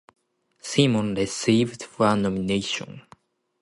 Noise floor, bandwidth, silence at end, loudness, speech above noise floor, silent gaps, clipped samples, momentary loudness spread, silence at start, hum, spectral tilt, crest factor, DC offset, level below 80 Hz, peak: -56 dBFS; 11.5 kHz; 0.6 s; -23 LUFS; 33 dB; none; under 0.1%; 9 LU; 0.65 s; none; -5 dB/octave; 18 dB; under 0.1%; -56 dBFS; -6 dBFS